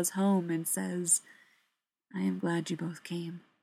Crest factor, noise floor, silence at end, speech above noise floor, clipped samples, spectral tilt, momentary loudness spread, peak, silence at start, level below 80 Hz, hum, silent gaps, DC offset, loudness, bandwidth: 18 dB; -80 dBFS; 0.25 s; 48 dB; under 0.1%; -4.5 dB/octave; 11 LU; -14 dBFS; 0 s; -86 dBFS; none; none; under 0.1%; -31 LUFS; 16 kHz